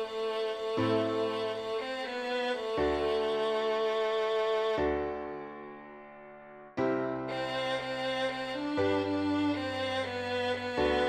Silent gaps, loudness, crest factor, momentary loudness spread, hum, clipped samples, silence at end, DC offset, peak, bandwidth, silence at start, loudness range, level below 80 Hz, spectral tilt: none; -32 LUFS; 16 dB; 12 LU; none; under 0.1%; 0 s; under 0.1%; -16 dBFS; 9.6 kHz; 0 s; 4 LU; -56 dBFS; -5.5 dB/octave